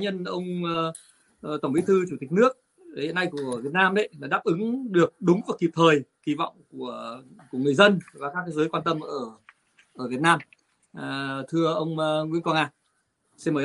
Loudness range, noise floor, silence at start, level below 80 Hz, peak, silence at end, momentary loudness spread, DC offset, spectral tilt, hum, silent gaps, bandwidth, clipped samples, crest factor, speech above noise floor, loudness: 4 LU; -72 dBFS; 0 s; -70 dBFS; -2 dBFS; 0 s; 15 LU; under 0.1%; -6 dB/octave; none; none; 11.5 kHz; under 0.1%; 24 dB; 47 dB; -25 LUFS